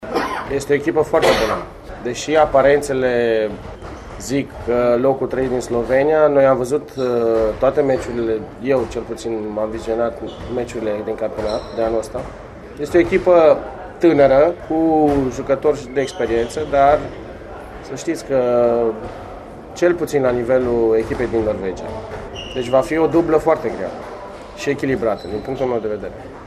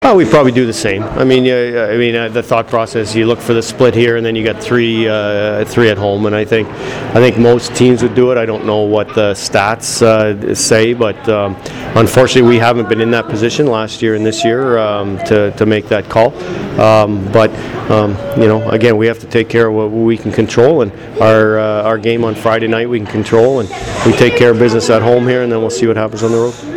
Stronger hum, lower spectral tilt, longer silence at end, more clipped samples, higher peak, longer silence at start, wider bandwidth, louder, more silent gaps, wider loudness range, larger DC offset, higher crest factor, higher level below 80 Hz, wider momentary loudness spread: neither; about the same, -6 dB/octave vs -5.5 dB/octave; about the same, 0 s vs 0 s; neither; about the same, -2 dBFS vs 0 dBFS; about the same, 0 s vs 0 s; second, 13.5 kHz vs 16.5 kHz; second, -18 LUFS vs -11 LUFS; neither; first, 6 LU vs 2 LU; neither; first, 16 dB vs 10 dB; about the same, -40 dBFS vs -40 dBFS; first, 17 LU vs 6 LU